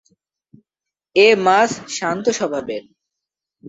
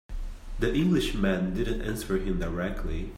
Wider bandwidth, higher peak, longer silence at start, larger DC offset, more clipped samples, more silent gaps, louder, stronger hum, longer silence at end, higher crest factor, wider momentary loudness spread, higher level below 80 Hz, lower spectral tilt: second, 8 kHz vs 16 kHz; first, -2 dBFS vs -12 dBFS; first, 1.15 s vs 0.1 s; neither; neither; neither; first, -17 LUFS vs -29 LUFS; neither; about the same, 0 s vs 0 s; about the same, 18 dB vs 16 dB; about the same, 14 LU vs 12 LU; second, -64 dBFS vs -34 dBFS; second, -3.5 dB/octave vs -6.5 dB/octave